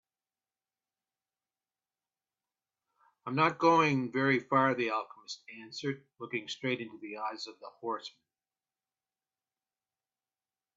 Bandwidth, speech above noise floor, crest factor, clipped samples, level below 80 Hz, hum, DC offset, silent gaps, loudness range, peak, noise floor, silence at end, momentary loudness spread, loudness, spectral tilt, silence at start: 7.8 kHz; over 58 dB; 24 dB; under 0.1%; -80 dBFS; none; under 0.1%; none; 14 LU; -12 dBFS; under -90 dBFS; 2.65 s; 18 LU; -31 LUFS; -5.5 dB/octave; 3.25 s